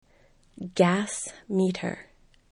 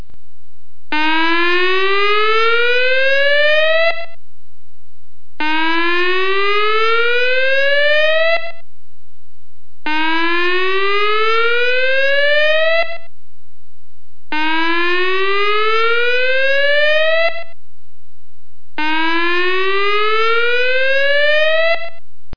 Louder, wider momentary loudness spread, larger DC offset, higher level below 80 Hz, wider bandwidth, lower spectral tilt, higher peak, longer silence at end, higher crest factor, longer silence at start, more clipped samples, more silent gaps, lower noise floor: second, -27 LUFS vs -14 LUFS; first, 15 LU vs 7 LU; second, under 0.1% vs 20%; about the same, -62 dBFS vs -60 dBFS; first, 11.5 kHz vs 5.4 kHz; about the same, -5.5 dB/octave vs -4.5 dB/octave; second, -8 dBFS vs -4 dBFS; first, 0.5 s vs 0 s; first, 22 dB vs 14 dB; first, 0.6 s vs 0 s; neither; neither; first, -60 dBFS vs -55 dBFS